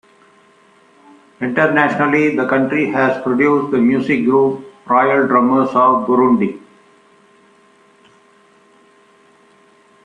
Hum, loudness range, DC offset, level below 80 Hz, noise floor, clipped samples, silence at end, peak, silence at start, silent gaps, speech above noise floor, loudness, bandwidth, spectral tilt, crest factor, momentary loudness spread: none; 5 LU; under 0.1%; -60 dBFS; -51 dBFS; under 0.1%; 3.45 s; -2 dBFS; 1.4 s; none; 37 dB; -14 LUFS; 9.2 kHz; -7.5 dB/octave; 16 dB; 5 LU